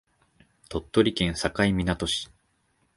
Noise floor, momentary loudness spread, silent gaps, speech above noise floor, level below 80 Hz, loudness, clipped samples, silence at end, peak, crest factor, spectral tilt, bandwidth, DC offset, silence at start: -70 dBFS; 12 LU; none; 44 dB; -44 dBFS; -26 LUFS; under 0.1%; 0.7 s; -6 dBFS; 22 dB; -5 dB/octave; 11.5 kHz; under 0.1%; 0.7 s